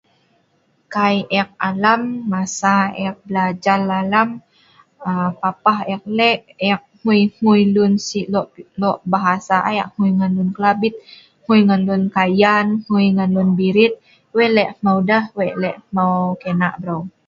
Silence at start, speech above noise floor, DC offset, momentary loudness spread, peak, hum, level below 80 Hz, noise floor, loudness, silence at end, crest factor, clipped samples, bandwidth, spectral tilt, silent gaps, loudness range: 0.9 s; 45 dB; under 0.1%; 8 LU; 0 dBFS; none; -60 dBFS; -61 dBFS; -17 LUFS; 0.2 s; 18 dB; under 0.1%; 7.6 kHz; -6 dB/octave; none; 3 LU